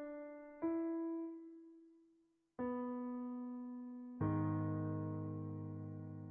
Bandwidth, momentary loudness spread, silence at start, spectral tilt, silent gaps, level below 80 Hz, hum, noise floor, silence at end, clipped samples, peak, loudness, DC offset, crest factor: 3.2 kHz; 13 LU; 0 s; -8 dB/octave; none; -74 dBFS; none; -76 dBFS; 0 s; under 0.1%; -28 dBFS; -44 LUFS; under 0.1%; 16 dB